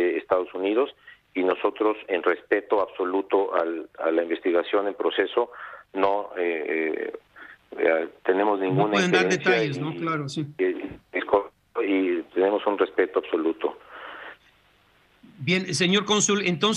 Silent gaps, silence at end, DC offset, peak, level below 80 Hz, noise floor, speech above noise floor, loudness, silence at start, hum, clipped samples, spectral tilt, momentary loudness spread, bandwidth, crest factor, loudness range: none; 0 s; under 0.1%; -6 dBFS; -66 dBFS; -61 dBFS; 36 dB; -25 LUFS; 0 s; none; under 0.1%; -4 dB/octave; 11 LU; 11.5 kHz; 20 dB; 3 LU